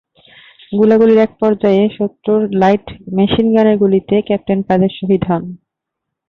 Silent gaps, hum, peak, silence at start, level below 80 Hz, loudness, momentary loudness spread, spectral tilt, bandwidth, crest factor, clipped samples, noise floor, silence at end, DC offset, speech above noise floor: none; none; -2 dBFS; 0.7 s; -46 dBFS; -13 LUFS; 8 LU; -9 dB/octave; 6.2 kHz; 12 dB; under 0.1%; -78 dBFS; 0.75 s; under 0.1%; 66 dB